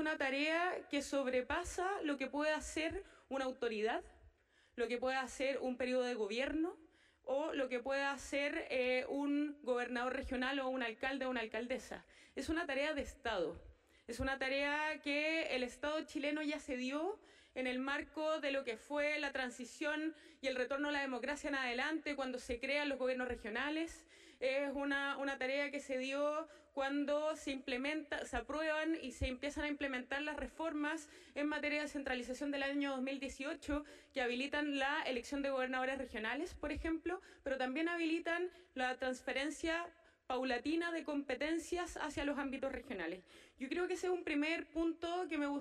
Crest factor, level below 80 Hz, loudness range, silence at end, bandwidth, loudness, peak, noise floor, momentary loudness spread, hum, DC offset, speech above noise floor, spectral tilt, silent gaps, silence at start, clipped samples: 16 dB; -62 dBFS; 2 LU; 0 s; 13 kHz; -40 LUFS; -24 dBFS; -69 dBFS; 6 LU; none; under 0.1%; 30 dB; -3.5 dB/octave; none; 0 s; under 0.1%